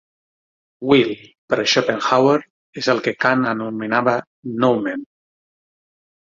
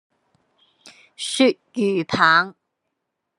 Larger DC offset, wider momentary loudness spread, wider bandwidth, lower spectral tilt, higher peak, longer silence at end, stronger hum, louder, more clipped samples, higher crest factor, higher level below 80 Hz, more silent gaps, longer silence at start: neither; about the same, 12 LU vs 13 LU; second, 7.6 kHz vs 12 kHz; about the same, -4.5 dB/octave vs -4 dB/octave; first, 0 dBFS vs -4 dBFS; first, 1.3 s vs 0.85 s; neither; about the same, -18 LUFS vs -19 LUFS; neither; about the same, 20 dB vs 20 dB; first, -62 dBFS vs -68 dBFS; first, 1.38-1.48 s, 2.50-2.73 s, 4.27-4.43 s vs none; about the same, 0.8 s vs 0.85 s